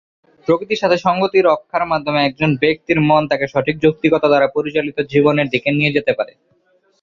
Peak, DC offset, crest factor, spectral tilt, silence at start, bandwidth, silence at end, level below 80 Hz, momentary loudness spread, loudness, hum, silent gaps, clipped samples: -2 dBFS; under 0.1%; 14 dB; -7 dB/octave; 0.5 s; 7.4 kHz; 0.75 s; -52 dBFS; 5 LU; -16 LUFS; none; none; under 0.1%